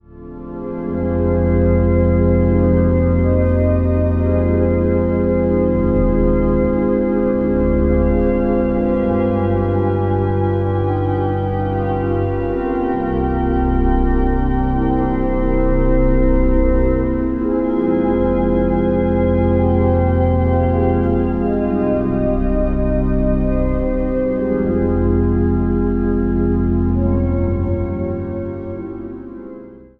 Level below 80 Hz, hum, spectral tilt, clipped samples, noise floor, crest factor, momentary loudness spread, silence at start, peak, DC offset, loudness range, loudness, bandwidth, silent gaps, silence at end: -22 dBFS; none; -12 dB/octave; under 0.1%; -36 dBFS; 14 dB; 5 LU; 0.15 s; -2 dBFS; under 0.1%; 3 LU; -17 LUFS; 3.5 kHz; none; 0.15 s